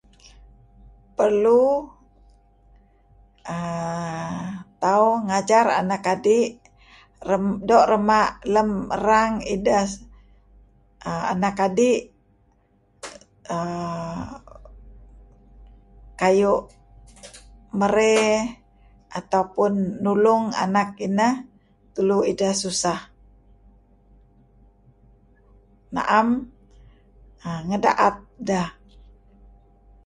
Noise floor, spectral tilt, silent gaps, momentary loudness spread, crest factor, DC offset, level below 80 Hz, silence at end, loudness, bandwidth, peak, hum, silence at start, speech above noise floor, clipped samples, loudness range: -61 dBFS; -5 dB/octave; none; 17 LU; 20 dB; under 0.1%; -52 dBFS; 1.35 s; -21 LUFS; 11.5 kHz; -4 dBFS; none; 1.2 s; 41 dB; under 0.1%; 9 LU